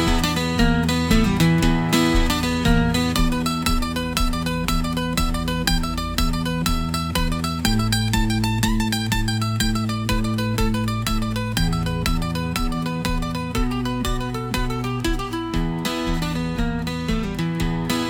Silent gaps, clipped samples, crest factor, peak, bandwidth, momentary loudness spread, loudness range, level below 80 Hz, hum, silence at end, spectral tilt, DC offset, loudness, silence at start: none; under 0.1%; 18 dB; -2 dBFS; 18.5 kHz; 6 LU; 5 LU; -28 dBFS; none; 0 s; -5 dB/octave; under 0.1%; -22 LUFS; 0 s